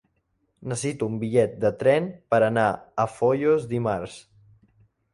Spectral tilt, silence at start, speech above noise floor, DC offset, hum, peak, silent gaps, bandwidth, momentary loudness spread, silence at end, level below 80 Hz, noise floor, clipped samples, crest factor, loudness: -6 dB/octave; 0.6 s; 48 dB; under 0.1%; none; -8 dBFS; none; 11.5 kHz; 9 LU; 0.95 s; -58 dBFS; -72 dBFS; under 0.1%; 18 dB; -24 LUFS